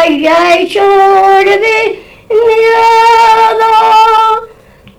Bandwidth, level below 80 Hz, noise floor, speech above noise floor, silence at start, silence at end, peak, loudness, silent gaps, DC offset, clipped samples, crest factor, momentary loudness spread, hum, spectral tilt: 19 kHz; -44 dBFS; -38 dBFS; 31 dB; 0 s; 0.5 s; 0 dBFS; -6 LUFS; none; under 0.1%; under 0.1%; 6 dB; 6 LU; none; -3 dB/octave